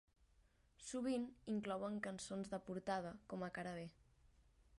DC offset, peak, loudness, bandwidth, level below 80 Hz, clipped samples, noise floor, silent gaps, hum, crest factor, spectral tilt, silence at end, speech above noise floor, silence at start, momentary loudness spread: under 0.1%; -30 dBFS; -46 LUFS; 11.5 kHz; -74 dBFS; under 0.1%; -75 dBFS; none; none; 18 dB; -5.5 dB/octave; 0 s; 29 dB; 0.8 s; 7 LU